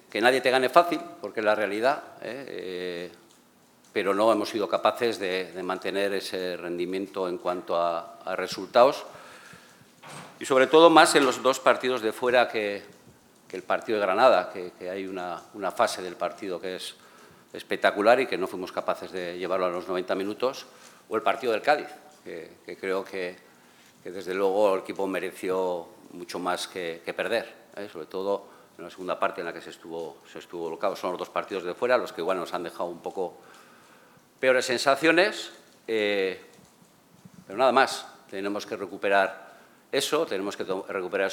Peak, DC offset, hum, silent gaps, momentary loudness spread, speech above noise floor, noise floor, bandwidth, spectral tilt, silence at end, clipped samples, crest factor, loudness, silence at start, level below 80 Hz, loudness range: 0 dBFS; under 0.1%; none; none; 19 LU; 32 dB; -59 dBFS; 19 kHz; -3.5 dB/octave; 0 s; under 0.1%; 26 dB; -26 LUFS; 0.15 s; -80 dBFS; 10 LU